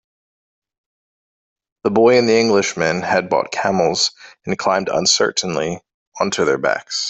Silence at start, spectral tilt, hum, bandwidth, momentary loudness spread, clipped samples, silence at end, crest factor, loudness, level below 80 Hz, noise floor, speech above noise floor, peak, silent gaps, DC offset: 1.85 s; -3 dB/octave; none; 8.4 kHz; 10 LU; under 0.1%; 0 s; 16 dB; -17 LUFS; -58 dBFS; under -90 dBFS; over 73 dB; -2 dBFS; 5.94-6.12 s; under 0.1%